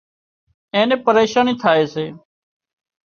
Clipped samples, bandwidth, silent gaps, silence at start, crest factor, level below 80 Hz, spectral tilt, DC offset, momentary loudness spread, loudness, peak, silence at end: under 0.1%; 7 kHz; none; 0.75 s; 18 dB; -62 dBFS; -5 dB/octave; under 0.1%; 10 LU; -17 LUFS; -2 dBFS; 0.9 s